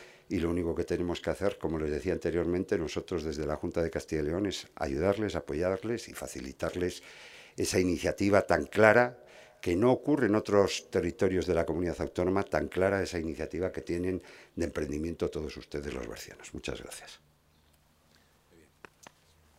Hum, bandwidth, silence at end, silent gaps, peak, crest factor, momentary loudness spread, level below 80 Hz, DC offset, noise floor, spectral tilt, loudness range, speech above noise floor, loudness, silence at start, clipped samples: none; 16 kHz; 2.4 s; none; -4 dBFS; 26 dB; 13 LU; -54 dBFS; under 0.1%; -66 dBFS; -5.5 dB/octave; 12 LU; 35 dB; -31 LUFS; 0 s; under 0.1%